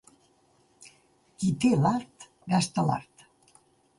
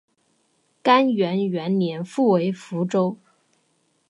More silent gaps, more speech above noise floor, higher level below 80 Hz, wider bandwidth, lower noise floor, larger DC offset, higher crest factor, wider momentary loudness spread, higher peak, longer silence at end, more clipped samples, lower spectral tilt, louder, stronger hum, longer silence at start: neither; second, 40 dB vs 46 dB; first, -64 dBFS vs -76 dBFS; about the same, 11.5 kHz vs 11 kHz; about the same, -65 dBFS vs -67 dBFS; neither; about the same, 18 dB vs 18 dB; first, 13 LU vs 9 LU; second, -12 dBFS vs -6 dBFS; about the same, 0.95 s vs 0.95 s; neither; about the same, -6 dB/octave vs -7 dB/octave; second, -27 LUFS vs -22 LUFS; neither; first, 1.4 s vs 0.85 s